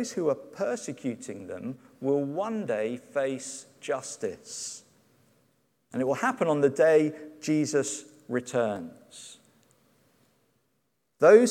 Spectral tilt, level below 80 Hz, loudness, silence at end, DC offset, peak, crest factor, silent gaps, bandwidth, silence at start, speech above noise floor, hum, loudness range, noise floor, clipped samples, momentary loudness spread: -5 dB/octave; -78 dBFS; -28 LUFS; 0 s; under 0.1%; -6 dBFS; 22 dB; none; 14 kHz; 0 s; 49 dB; none; 8 LU; -76 dBFS; under 0.1%; 17 LU